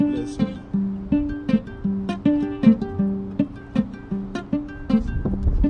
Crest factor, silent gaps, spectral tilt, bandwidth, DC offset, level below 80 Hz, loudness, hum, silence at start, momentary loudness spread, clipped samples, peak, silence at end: 18 dB; none; -8.5 dB/octave; 8.8 kHz; under 0.1%; -32 dBFS; -24 LUFS; none; 0 s; 10 LU; under 0.1%; -4 dBFS; 0 s